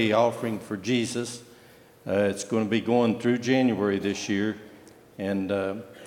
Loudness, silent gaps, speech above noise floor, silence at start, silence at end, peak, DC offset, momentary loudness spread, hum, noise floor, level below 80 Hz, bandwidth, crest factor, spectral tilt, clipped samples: -26 LUFS; none; 27 dB; 0 s; 0 s; -10 dBFS; under 0.1%; 10 LU; none; -53 dBFS; -70 dBFS; 16.5 kHz; 18 dB; -5.5 dB/octave; under 0.1%